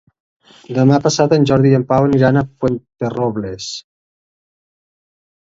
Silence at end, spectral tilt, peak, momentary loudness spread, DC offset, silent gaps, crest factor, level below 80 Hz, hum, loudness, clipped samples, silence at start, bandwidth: 1.75 s; -6.5 dB/octave; 0 dBFS; 12 LU; under 0.1%; none; 16 dB; -48 dBFS; none; -15 LUFS; under 0.1%; 0.7 s; 7.8 kHz